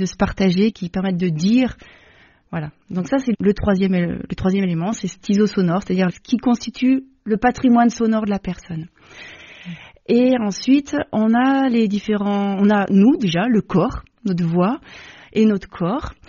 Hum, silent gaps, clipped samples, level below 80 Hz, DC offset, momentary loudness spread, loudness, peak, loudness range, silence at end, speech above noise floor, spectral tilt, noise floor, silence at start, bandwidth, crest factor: none; none; under 0.1%; -44 dBFS; under 0.1%; 14 LU; -19 LUFS; -2 dBFS; 4 LU; 0.15 s; 33 dB; -6.5 dB/octave; -51 dBFS; 0 s; 7.2 kHz; 16 dB